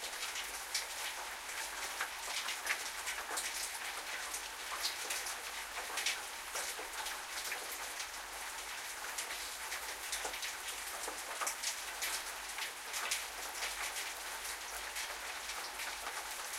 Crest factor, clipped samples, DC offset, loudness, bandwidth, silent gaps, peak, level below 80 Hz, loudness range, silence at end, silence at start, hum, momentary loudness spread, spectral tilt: 22 dB; under 0.1%; under 0.1%; -39 LUFS; 16.5 kHz; none; -20 dBFS; -68 dBFS; 2 LU; 0 s; 0 s; none; 5 LU; 1.5 dB/octave